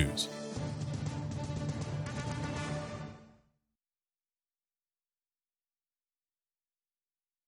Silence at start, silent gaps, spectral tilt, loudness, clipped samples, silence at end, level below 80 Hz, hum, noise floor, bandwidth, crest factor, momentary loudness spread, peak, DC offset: 0 s; none; -5 dB/octave; -38 LUFS; under 0.1%; 4.15 s; -54 dBFS; none; under -90 dBFS; 14.5 kHz; 24 dB; 7 LU; -16 dBFS; under 0.1%